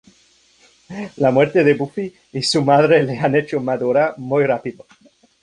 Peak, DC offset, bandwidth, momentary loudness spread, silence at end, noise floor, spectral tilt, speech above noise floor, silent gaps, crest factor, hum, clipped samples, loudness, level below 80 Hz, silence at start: -2 dBFS; under 0.1%; 11 kHz; 14 LU; 0.7 s; -55 dBFS; -5.5 dB/octave; 38 dB; none; 16 dB; none; under 0.1%; -17 LUFS; -58 dBFS; 0.9 s